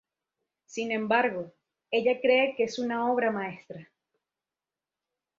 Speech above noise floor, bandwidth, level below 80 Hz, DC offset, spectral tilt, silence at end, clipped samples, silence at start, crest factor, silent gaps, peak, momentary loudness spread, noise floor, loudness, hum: over 63 dB; 7.6 kHz; -76 dBFS; under 0.1%; -4.5 dB/octave; 1.55 s; under 0.1%; 0.7 s; 20 dB; none; -10 dBFS; 20 LU; under -90 dBFS; -27 LUFS; none